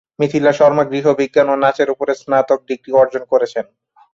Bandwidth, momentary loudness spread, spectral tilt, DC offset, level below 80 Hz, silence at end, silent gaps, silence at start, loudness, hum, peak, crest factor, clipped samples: 7.6 kHz; 7 LU; -6 dB/octave; under 0.1%; -60 dBFS; 0.5 s; none; 0.2 s; -15 LUFS; none; -2 dBFS; 14 dB; under 0.1%